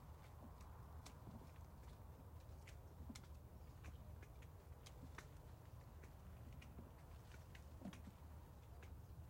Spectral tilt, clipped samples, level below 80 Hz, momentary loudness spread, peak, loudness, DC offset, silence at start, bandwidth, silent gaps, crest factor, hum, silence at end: -6 dB/octave; under 0.1%; -62 dBFS; 3 LU; -40 dBFS; -60 LUFS; under 0.1%; 0 s; 16.5 kHz; none; 18 dB; none; 0 s